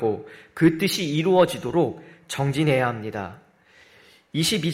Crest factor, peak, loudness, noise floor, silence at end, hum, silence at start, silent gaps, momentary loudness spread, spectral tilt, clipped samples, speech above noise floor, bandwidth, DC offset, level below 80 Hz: 18 dB; -6 dBFS; -23 LUFS; -55 dBFS; 0 s; none; 0 s; none; 14 LU; -5.5 dB/octave; under 0.1%; 32 dB; 16 kHz; under 0.1%; -58 dBFS